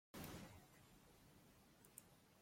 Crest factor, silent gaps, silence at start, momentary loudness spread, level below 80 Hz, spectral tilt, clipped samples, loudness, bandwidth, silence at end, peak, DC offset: 22 dB; none; 0.15 s; 13 LU; -76 dBFS; -4 dB/octave; under 0.1%; -62 LUFS; 16.5 kHz; 0 s; -40 dBFS; under 0.1%